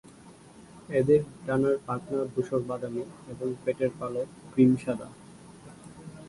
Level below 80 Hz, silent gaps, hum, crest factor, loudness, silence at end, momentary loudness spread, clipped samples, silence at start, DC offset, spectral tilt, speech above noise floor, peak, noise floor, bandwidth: -62 dBFS; none; none; 20 dB; -28 LUFS; 0 s; 24 LU; under 0.1%; 0.25 s; under 0.1%; -8 dB/octave; 24 dB; -10 dBFS; -51 dBFS; 11.5 kHz